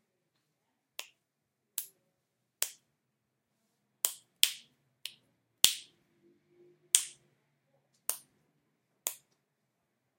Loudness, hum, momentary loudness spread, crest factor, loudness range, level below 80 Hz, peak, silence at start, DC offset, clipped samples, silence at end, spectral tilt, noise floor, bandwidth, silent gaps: -31 LUFS; none; 20 LU; 40 dB; 12 LU; -78 dBFS; 0 dBFS; 1 s; under 0.1%; under 0.1%; 1.05 s; 3 dB/octave; -84 dBFS; 16.5 kHz; none